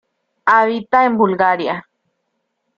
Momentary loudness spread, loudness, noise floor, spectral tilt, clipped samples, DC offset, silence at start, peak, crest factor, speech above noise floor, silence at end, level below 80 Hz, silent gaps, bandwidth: 9 LU; -15 LUFS; -72 dBFS; -7 dB/octave; under 0.1%; under 0.1%; 0.45 s; -2 dBFS; 16 dB; 57 dB; 1 s; -62 dBFS; none; 7.2 kHz